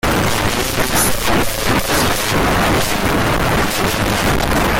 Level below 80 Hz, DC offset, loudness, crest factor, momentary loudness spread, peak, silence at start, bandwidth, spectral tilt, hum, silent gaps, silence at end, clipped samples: -26 dBFS; under 0.1%; -15 LUFS; 12 dB; 2 LU; -2 dBFS; 0.05 s; 17 kHz; -3.5 dB/octave; none; none; 0 s; under 0.1%